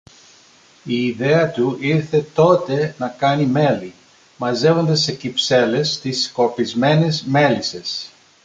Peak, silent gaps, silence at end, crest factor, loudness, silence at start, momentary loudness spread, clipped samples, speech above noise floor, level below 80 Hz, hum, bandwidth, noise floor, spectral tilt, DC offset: -2 dBFS; none; 0.35 s; 16 dB; -18 LUFS; 0.85 s; 9 LU; under 0.1%; 32 dB; -58 dBFS; none; 9 kHz; -50 dBFS; -5.5 dB/octave; under 0.1%